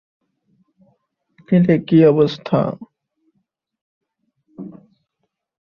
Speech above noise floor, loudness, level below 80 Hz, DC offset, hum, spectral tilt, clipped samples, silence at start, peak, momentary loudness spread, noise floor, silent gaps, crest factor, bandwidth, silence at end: 61 dB; -16 LUFS; -60 dBFS; under 0.1%; none; -9.5 dB/octave; under 0.1%; 1.5 s; -2 dBFS; 24 LU; -75 dBFS; 3.81-4.01 s; 18 dB; 6.6 kHz; 0.95 s